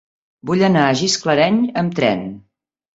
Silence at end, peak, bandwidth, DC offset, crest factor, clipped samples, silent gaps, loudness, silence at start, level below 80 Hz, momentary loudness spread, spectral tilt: 0.6 s; -2 dBFS; 8 kHz; under 0.1%; 16 dB; under 0.1%; none; -16 LUFS; 0.45 s; -56 dBFS; 10 LU; -5 dB/octave